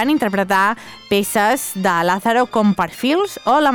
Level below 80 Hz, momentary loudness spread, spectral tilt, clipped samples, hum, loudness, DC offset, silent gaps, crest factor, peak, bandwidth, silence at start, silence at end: -54 dBFS; 4 LU; -4.5 dB/octave; under 0.1%; none; -17 LUFS; under 0.1%; none; 12 dB; -4 dBFS; over 20 kHz; 0 s; 0 s